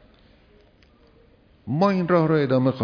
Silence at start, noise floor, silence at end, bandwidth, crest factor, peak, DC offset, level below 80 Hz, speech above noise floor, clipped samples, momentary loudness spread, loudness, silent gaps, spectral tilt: 1.65 s; -56 dBFS; 0 s; 5.4 kHz; 16 dB; -8 dBFS; under 0.1%; -58 dBFS; 36 dB; under 0.1%; 10 LU; -21 LUFS; none; -9 dB/octave